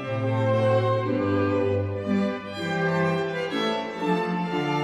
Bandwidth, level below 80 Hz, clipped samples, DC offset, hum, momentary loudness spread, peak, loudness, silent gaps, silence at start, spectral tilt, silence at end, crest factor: 11 kHz; -64 dBFS; under 0.1%; under 0.1%; none; 5 LU; -10 dBFS; -25 LUFS; none; 0 s; -7 dB/octave; 0 s; 14 dB